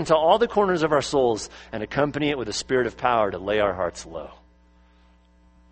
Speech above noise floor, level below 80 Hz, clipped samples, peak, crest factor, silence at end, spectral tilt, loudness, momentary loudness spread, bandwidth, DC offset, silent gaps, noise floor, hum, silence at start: 33 dB; -50 dBFS; under 0.1%; -4 dBFS; 20 dB; 1.4 s; -4.5 dB/octave; -23 LUFS; 15 LU; 8.8 kHz; under 0.1%; none; -56 dBFS; none; 0 s